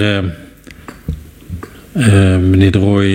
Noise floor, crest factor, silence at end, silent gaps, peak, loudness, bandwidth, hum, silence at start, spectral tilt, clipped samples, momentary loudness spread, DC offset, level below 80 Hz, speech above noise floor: -35 dBFS; 12 dB; 0 s; none; 0 dBFS; -12 LUFS; 10.5 kHz; none; 0 s; -7 dB/octave; under 0.1%; 20 LU; under 0.1%; -34 dBFS; 25 dB